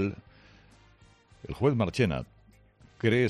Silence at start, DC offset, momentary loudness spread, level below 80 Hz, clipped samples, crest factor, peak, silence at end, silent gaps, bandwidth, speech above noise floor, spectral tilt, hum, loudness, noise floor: 0 s; under 0.1%; 21 LU; -54 dBFS; under 0.1%; 18 dB; -12 dBFS; 0 s; none; 11.5 kHz; 33 dB; -7 dB/octave; none; -29 LUFS; -59 dBFS